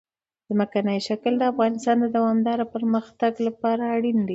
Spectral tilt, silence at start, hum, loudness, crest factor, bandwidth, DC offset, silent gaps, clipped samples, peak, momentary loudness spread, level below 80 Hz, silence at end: -6.5 dB/octave; 0.5 s; none; -23 LUFS; 14 dB; 8 kHz; under 0.1%; none; under 0.1%; -8 dBFS; 4 LU; -68 dBFS; 0 s